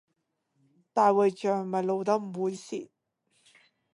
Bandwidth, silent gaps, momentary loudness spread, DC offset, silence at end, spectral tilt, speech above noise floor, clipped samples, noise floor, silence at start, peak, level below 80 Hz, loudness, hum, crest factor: 11 kHz; none; 14 LU; under 0.1%; 1.1 s; -6.5 dB/octave; 52 dB; under 0.1%; -79 dBFS; 0.95 s; -10 dBFS; -82 dBFS; -27 LUFS; none; 20 dB